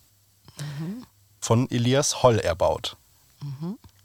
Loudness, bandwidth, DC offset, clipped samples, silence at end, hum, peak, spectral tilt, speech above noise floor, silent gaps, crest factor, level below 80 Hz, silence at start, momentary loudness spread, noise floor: -24 LUFS; 16.5 kHz; under 0.1%; under 0.1%; 0.2 s; none; -4 dBFS; -5 dB/octave; 33 dB; none; 22 dB; -50 dBFS; 0.55 s; 18 LU; -56 dBFS